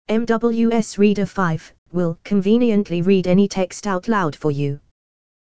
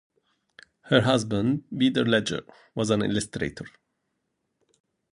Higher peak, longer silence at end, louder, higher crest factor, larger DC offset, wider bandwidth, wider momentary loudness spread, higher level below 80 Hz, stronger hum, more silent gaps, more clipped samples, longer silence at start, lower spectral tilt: about the same, -4 dBFS vs -4 dBFS; second, 0.55 s vs 1.45 s; first, -19 LUFS vs -25 LUFS; second, 14 dB vs 24 dB; first, 2% vs under 0.1%; second, 9.2 kHz vs 11.5 kHz; second, 8 LU vs 14 LU; first, -50 dBFS vs -56 dBFS; neither; first, 1.78-1.86 s vs none; neither; second, 0.05 s vs 0.85 s; first, -7 dB/octave vs -5 dB/octave